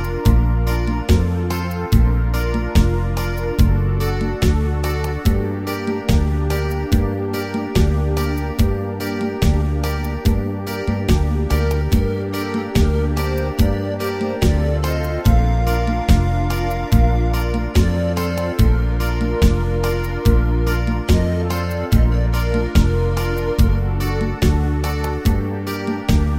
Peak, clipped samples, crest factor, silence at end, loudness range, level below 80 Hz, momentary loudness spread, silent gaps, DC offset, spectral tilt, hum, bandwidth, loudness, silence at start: -2 dBFS; under 0.1%; 16 dB; 0 s; 2 LU; -20 dBFS; 5 LU; none; under 0.1%; -7 dB/octave; none; 16.5 kHz; -19 LUFS; 0 s